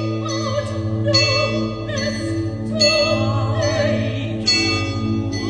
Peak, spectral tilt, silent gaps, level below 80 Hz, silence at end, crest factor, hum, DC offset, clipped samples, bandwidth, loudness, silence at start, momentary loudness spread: -4 dBFS; -4.5 dB/octave; none; -42 dBFS; 0 s; 16 dB; none; under 0.1%; under 0.1%; 10 kHz; -19 LUFS; 0 s; 8 LU